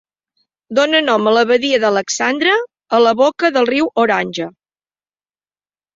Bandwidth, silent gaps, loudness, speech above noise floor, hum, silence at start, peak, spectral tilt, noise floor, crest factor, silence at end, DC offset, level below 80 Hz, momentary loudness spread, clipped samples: 7.8 kHz; none; -14 LUFS; over 76 dB; 50 Hz at -80 dBFS; 0.7 s; -2 dBFS; -3 dB/octave; under -90 dBFS; 14 dB; 1.45 s; under 0.1%; -62 dBFS; 5 LU; under 0.1%